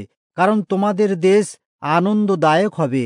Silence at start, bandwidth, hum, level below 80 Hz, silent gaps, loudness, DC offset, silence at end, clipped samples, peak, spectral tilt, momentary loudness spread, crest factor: 0 s; 11 kHz; none; -72 dBFS; 0.17-0.30 s, 1.66-1.79 s; -17 LUFS; under 0.1%; 0 s; under 0.1%; -4 dBFS; -6.5 dB/octave; 8 LU; 12 dB